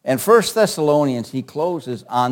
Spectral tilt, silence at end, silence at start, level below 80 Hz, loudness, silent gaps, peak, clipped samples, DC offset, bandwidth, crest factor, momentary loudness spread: -5 dB/octave; 0 s; 0.05 s; -62 dBFS; -18 LUFS; none; 0 dBFS; under 0.1%; under 0.1%; 17 kHz; 18 dB; 11 LU